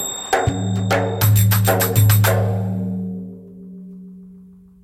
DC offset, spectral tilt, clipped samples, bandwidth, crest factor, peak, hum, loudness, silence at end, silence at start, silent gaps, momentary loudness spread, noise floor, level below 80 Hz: under 0.1%; -5 dB/octave; under 0.1%; 17 kHz; 16 dB; -2 dBFS; none; -18 LUFS; 0.45 s; 0 s; none; 23 LU; -44 dBFS; -42 dBFS